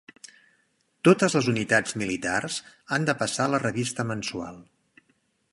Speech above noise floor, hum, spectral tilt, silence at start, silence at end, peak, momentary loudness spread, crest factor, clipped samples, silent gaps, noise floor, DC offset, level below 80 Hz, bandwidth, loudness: 44 dB; none; -4.5 dB/octave; 1.05 s; 0.9 s; -6 dBFS; 12 LU; 22 dB; under 0.1%; none; -69 dBFS; under 0.1%; -62 dBFS; 11.5 kHz; -25 LUFS